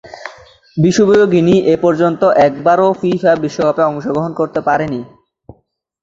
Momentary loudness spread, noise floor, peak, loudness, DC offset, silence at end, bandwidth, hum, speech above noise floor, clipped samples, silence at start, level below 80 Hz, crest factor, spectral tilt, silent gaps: 12 LU; -57 dBFS; 0 dBFS; -13 LUFS; under 0.1%; 0.95 s; 7.8 kHz; none; 45 dB; under 0.1%; 0.05 s; -50 dBFS; 12 dB; -6.5 dB/octave; none